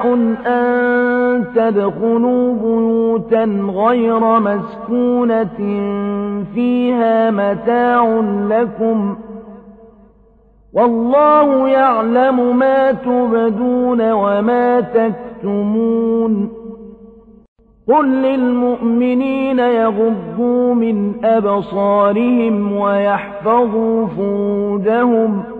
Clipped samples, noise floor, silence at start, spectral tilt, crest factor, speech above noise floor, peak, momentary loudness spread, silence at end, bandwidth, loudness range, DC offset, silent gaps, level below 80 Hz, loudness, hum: under 0.1%; -49 dBFS; 0 s; -9.5 dB/octave; 12 dB; 35 dB; -2 dBFS; 6 LU; 0 s; 4.3 kHz; 4 LU; under 0.1%; 17.48-17.56 s; -50 dBFS; -15 LUFS; none